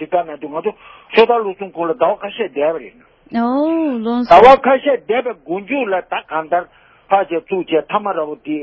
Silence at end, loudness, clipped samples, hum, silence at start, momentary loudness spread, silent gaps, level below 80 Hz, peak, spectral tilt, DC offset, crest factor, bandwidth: 0 s; -16 LUFS; 0.3%; none; 0 s; 13 LU; none; -50 dBFS; 0 dBFS; -6.5 dB/octave; under 0.1%; 16 dB; 8 kHz